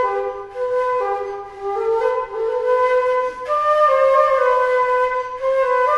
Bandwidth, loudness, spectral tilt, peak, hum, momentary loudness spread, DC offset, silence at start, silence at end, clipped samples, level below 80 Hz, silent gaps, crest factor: 9.4 kHz; -18 LUFS; -3.5 dB/octave; -2 dBFS; none; 11 LU; under 0.1%; 0 s; 0 s; under 0.1%; -54 dBFS; none; 16 dB